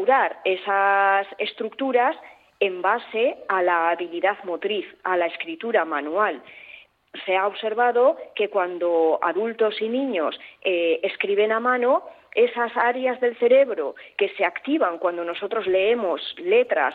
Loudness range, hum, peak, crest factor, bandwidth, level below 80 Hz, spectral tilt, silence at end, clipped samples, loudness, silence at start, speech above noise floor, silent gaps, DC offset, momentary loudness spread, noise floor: 3 LU; none; -8 dBFS; 16 dB; 4.7 kHz; -74 dBFS; -6.5 dB/octave; 0 s; under 0.1%; -22 LUFS; 0 s; 25 dB; none; under 0.1%; 9 LU; -47 dBFS